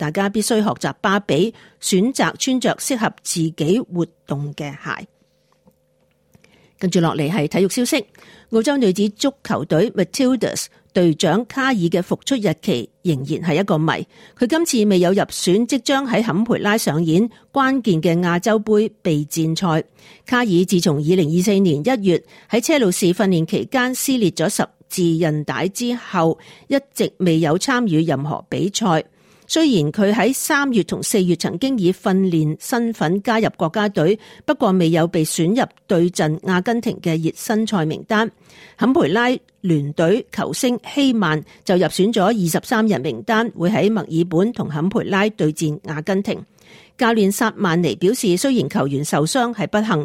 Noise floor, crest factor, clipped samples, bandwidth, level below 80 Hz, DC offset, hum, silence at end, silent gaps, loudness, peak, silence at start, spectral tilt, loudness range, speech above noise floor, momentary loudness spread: -62 dBFS; 14 dB; under 0.1%; 16.5 kHz; -58 dBFS; under 0.1%; none; 0 s; none; -19 LUFS; -4 dBFS; 0 s; -5 dB/octave; 3 LU; 44 dB; 6 LU